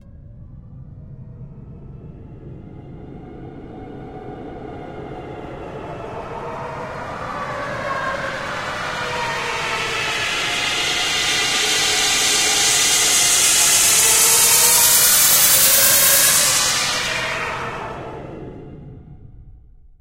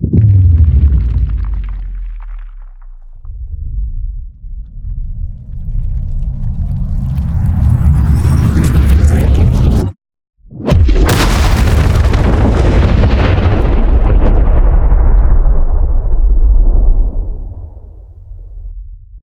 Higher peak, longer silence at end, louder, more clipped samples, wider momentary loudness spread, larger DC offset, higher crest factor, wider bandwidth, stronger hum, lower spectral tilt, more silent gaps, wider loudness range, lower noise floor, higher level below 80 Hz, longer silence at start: about the same, 0 dBFS vs 0 dBFS; first, 0.5 s vs 0.05 s; about the same, -14 LUFS vs -12 LUFS; neither; first, 23 LU vs 19 LU; neither; first, 18 dB vs 10 dB; about the same, 16 kHz vs 15.5 kHz; neither; second, 0 dB/octave vs -7 dB/octave; neither; first, 22 LU vs 14 LU; first, -44 dBFS vs -32 dBFS; second, -44 dBFS vs -12 dBFS; about the same, 0.05 s vs 0 s